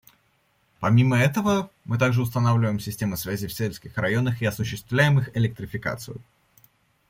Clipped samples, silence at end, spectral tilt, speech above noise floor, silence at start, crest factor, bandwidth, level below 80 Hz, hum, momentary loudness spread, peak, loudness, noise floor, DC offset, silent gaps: under 0.1%; 0.9 s; -6.5 dB/octave; 43 dB; 0.8 s; 18 dB; 16.5 kHz; -54 dBFS; none; 10 LU; -6 dBFS; -24 LUFS; -66 dBFS; under 0.1%; none